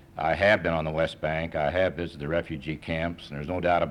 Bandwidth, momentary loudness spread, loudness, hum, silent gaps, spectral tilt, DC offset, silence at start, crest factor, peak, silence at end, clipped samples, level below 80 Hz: 11 kHz; 12 LU; -27 LUFS; none; none; -7 dB/octave; under 0.1%; 0.15 s; 18 dB; -10 dBFS; 0 s; under 0.1%; -46 dBFS